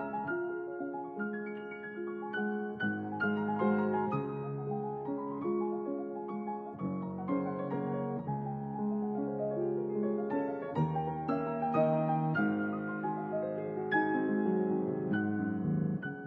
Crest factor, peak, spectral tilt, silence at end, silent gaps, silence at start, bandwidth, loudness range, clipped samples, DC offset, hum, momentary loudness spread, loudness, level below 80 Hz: 16 dB; -18 dBFS; -10.5 dB/octave; 0 s; none; 0 s; 4.6 kHz; 4 LU; under 0.1%; under 0.1%; none; 8 LU; -34 LUFS; -70 dBFS